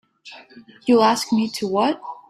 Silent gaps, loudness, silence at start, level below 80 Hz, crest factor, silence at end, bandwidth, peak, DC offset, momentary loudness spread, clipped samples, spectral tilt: none; -19 LUFS; 0.25 s; -66 dBFS; 16 dB; 0.15 s; 14.5 kHz; -4 dBFS; under 0.1%; 11 LU; under 0.1%; -4.5 dB/octave